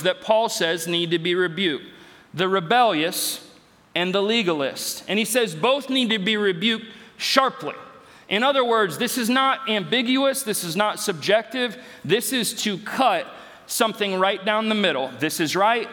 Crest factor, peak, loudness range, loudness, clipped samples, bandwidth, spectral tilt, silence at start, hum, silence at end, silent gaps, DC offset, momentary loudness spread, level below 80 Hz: 22 dB; 0 dBFS; 2 LU; -22 LUFS; under 0.1%; 19.5 kHz; -3 dB/octave; 0 s; none; 0 s; none; under 0.1%; 8 LU; -72 dBFS